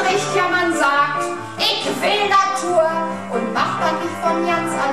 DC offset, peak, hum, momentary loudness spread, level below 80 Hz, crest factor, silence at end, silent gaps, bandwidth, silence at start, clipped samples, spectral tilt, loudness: 0.6%; -4 dBFS; none; 7 LU; -60 dBFS; 14 dB; 0 s; none; 14.5 kHz; 0 s; under 0.1%; -3.5 dB/octave; -18 LUFS